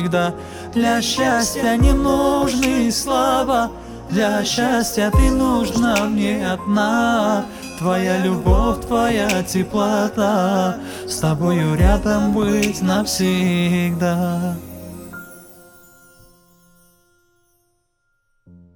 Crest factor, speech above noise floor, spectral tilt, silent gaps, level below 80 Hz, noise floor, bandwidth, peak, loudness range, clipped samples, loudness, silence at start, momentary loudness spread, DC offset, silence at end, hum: 16 dB; 50 dB; -5 dB/octave; none; -28 dBFS; -68 dBFS; 19 kHz; -2 dBFS; 4 LU; under 0.1%; -18 LUFS; 0 s; 8 LU; under 0.1%; 3.25 s; none